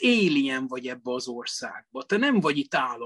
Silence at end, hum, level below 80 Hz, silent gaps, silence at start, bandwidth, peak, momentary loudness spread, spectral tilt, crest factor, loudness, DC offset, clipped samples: 0 s; none; -72 dBFS; none; 0 s; 12 kHz; -10 dBFS; 12 LU; -4.5 dB/octave; 16 dB; -26 LUFS; under 0.1%; under 0.1%